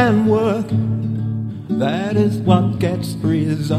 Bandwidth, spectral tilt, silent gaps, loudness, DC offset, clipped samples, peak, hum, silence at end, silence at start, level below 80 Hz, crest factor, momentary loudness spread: 13.5 kHz; -8 dB/octave; none; -18 LUFS; under 0.1%; under 0.1%; 0 dBFS; none; 0 s; 0 s; -48 dBFS; 18 dB; 7 LU